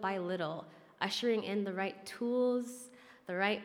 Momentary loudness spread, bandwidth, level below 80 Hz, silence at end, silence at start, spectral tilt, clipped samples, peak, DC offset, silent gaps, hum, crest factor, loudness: 17 LU; 16.5 kHz; -86 dBFS; 0 s; 0 s; -4.5 dB/octave; under 0.1%; -16 dBFS; under 0.1%; none; none; 20 dB; -36 LUFS